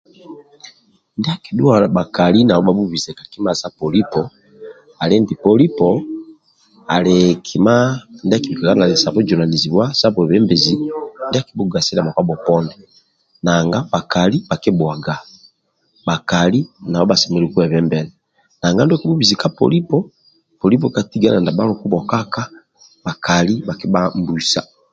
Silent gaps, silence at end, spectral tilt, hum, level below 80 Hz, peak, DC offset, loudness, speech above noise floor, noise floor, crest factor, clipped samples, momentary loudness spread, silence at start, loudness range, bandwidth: none; 0.3 s; -5.5 dB/octave; none; -48 dBFS; 0 dBFS; under 0.1%; -16 LUFS; 46 dB; -61 dBFS; 16 dB; under 0.1%; 10 LU; 0.3 s; 4 LU; 7.8 kHz